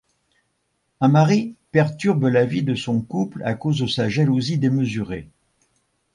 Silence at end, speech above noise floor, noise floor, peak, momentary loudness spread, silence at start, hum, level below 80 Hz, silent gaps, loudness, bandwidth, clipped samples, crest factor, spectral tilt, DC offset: 0.9 s; 52 dB; -71 dBFS; -4 dBFS; 8 LU; 1 s; none; -54 dBFS; none; -20 LUFS; 11 kHz; under 0.1%; 18 dB; -7 dB/octave; under 0.1%